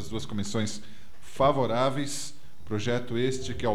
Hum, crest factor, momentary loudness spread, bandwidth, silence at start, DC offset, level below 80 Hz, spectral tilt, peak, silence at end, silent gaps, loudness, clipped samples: none; 18 dB; 11 LU; 17 kHz; 0 s; 2%; -52 dBFS; -5 dB/octave; -10 dBFS; 0 s; none; -29 LUFS; under 0.1%